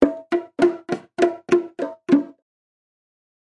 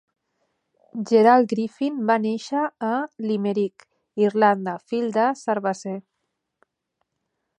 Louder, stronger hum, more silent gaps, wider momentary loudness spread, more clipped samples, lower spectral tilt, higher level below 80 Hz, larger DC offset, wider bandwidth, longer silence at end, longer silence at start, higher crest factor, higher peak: about the same, -22 LUFS vs -22 LUFS; neither; neither; second, 10 LU vs 14 LU; neither; about the same, -6 dB/octave vs -6.5 dB/octave; first, -58 dBFS vs -78 dBFS; neither; about the same, 10 kHz vs 9.4 kHz; second, 1.2 s vs 1.6 s; second, 0 s vs 0.95 s; about the same, 22 dB vs 20 dB; first, 0 dBFS vs -4 dBFS